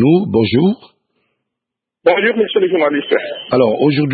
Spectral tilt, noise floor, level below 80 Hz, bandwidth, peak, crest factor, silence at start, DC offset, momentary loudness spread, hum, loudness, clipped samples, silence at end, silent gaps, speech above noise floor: -11.5 dB/octave; -82 dBFS; -54 dBFS; 4.8 kHz; 0 dBFS; 14 dB; 0 s; under 0.1%; 5 LU; none; -14 LUFS; under 0.1%; 0 s; none; 68 dB